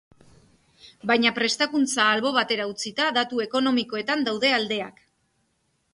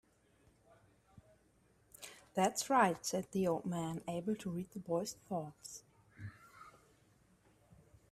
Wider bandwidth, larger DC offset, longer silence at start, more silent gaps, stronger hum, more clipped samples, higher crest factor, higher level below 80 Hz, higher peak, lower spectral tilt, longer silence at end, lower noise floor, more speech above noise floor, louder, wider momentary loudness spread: second, 11.5 kHz vs 15.5 kHz; neither; second, 0.85 s vs 1.15 s; neither; neither; neither; second, 18 dB vs 24 dB; about the same, -70 dBFS vs -74 dBFS; first, -6 dBFS vs -16 dBFS; second, -2.5 dB/octave vs -4.5 dB/octave; second, 1.05 s vs 1.4 s; about the same, -71 dBFS vs -71 dBFS; first, 47 dB vs 34 dB; first, -23 LUFS vs -37 LUFS; second, 8 LU vs 22 LU